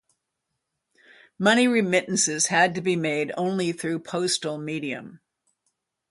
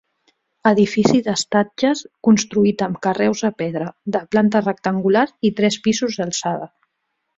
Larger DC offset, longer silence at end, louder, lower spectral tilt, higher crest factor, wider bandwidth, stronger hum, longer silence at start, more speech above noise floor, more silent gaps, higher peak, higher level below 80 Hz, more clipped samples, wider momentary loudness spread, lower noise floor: neither; first, 0.95 s vs 0.7 s; second, -23 LUFS vs -19 LUFS; second, -3.5 dB/octave vs -5 dB/octave; about the same, 20 dB vs 18 dB; first, 11.5 kHz vs 7.8 kHz; neither; first, 1.4 s vs 0.65 s; about the same, 57 dB vs 56 dB; neither; second, -6 dBFS vs -2 dBFS; second, -72 dBFS vs -58 dBFS; neither; about the same, 10 LU vs 9 LU; first, -81 dBFS vs -74 dBFS